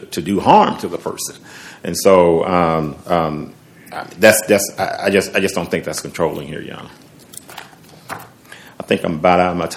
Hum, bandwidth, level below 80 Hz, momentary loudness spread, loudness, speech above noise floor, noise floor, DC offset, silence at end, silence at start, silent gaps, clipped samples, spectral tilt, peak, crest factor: none; 17 kHz; -50 dBFS; 22 LU; -16 LUFS; 25 dB; -41 dBFS; under 0.1%; 0 s; 0 s; none; 0.1%; -4.5 dB/octave; 0 dBFS; 18 dB